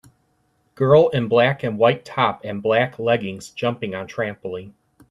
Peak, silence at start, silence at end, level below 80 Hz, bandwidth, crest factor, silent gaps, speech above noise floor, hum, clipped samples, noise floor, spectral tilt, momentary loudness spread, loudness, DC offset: -2 dBFS; 0.8 s; 0.4 s; -60 dBFS; 11.5 kHz; 18 dB; none; 46 dB; none; under 0.1%; -65 dBFS; -6.5 dB/octave; 13 LU; -20 LUFS; under 0.1%